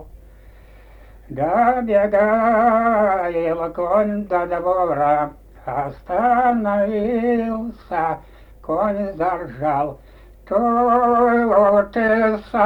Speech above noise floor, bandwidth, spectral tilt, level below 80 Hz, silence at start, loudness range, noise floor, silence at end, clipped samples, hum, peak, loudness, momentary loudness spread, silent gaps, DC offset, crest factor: 26 dB; 8.6 kHz; -8.5 dB/octave; -44 dBFS; 0 s; 4 LU; -44 dBFS; 0 s; under 0.1%; none; -4 dBFS; -19 LUFS; 10 LU; none; under 0.1%; 14 dB